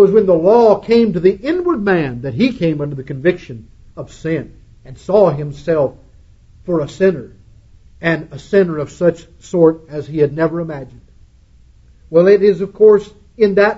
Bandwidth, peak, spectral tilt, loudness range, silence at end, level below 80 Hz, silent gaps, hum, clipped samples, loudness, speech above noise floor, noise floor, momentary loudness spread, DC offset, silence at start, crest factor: 7.8 kHz; 0 dBFS; -8 dB/octave; 5 LU; 0 s; -44 dBFS; none; none; under 0.1%; -15 LUFS; 32 dB; -46 dBFS; 16 LU; under 0.1%; 0 s; 14 dB